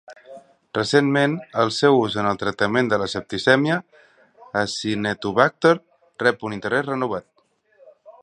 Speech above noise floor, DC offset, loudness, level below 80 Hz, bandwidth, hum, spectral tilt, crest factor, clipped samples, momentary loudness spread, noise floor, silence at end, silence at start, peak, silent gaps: 42 dB; under 0.1%; -21 LUFS; -58 dBFS; 11 kHz; none; -5 dB/octave; 22 dB; under 0.1%; 9 LU; -63 dBFS; 0.1 s; 0.1 s; 0 dBFS; none